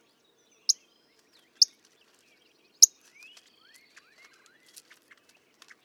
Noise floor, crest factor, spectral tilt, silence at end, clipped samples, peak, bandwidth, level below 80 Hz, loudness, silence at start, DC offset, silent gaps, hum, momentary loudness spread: -66 dBFS; 32 dB; 5.5 dB/octave; 3 s; under 0.1%; 0 dBFS; 18.5 kHz; under -90 dBFS; -22 LUFS; 0.7 s; under 0.1%; none; none; 10 LU